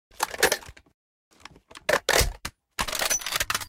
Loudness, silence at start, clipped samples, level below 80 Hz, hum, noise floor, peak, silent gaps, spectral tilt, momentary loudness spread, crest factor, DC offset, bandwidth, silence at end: -25 LUFS; 0.2 s; under 0.1%; -40 dBFS; none; -49 dBFS; -6 dBFS; 0.94-1.31 s; -1 dB/octave; 13 LU; 22 dB; under 0.1%; 16.5 kHz; 0 s